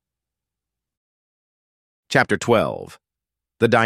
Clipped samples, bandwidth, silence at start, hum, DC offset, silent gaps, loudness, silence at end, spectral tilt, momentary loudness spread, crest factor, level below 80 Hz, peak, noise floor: under 0.1%; 14.5 kHz; 2.1 s; none; under 0.1%; none; -20 LUFS; 0 s; -5 dB/octave; 14 LU; 22 dB; -58 dBFS; -2 dBFS; -87 dBFS